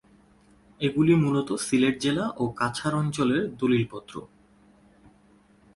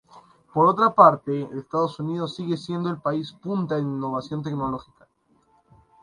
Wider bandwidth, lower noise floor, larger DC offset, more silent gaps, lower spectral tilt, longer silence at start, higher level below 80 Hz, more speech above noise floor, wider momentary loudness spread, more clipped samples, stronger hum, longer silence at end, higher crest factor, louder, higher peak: about the same, 11.5 kHz vs 11 kHz; second, -58 dBFS vs -64 dBFS; neither; neither; second, -6 dB/octave vs -8 dB/octave; first, 0.8 s vs 0.15 s; about the same, -58 dBFS vs -62 dBFS; second, 34 dB vs 41 dB; second, 10 LU vs 13 LU; neither; neither; first, 1.5 s vs 1.2 s; second, 18 dB vs 24 dB; about the same, -25 LUFS vs -23 LUFS; second, -10 dBFS vs 0 dBFS